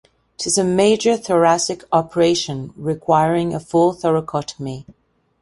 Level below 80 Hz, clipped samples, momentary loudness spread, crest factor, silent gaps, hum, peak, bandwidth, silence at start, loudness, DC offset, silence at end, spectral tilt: -54 dBFS; under 0.1%; 11 LU; 16 dB; none; none; -2 dBFS; 11.5 kHz; 0.4 s; -18 LUFS; under 0.1%; 0.5 s; -4.5 dB/octave